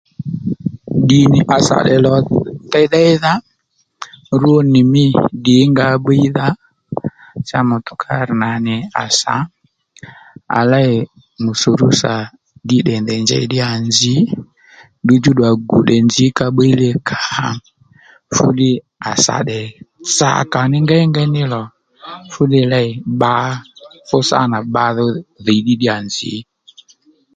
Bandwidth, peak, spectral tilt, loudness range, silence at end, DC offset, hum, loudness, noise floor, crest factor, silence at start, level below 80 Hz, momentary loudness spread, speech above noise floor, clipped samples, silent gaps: 9.4 kHz; 0 dBFS; -5 dB/octave; 4 LU; 0.95 s; under 0.1%; none; -14 LUFS; -63 dBFS; 14 dB; 0.2 s; -48 dBFS; 13 LU; 50 dB; under 0.1%; none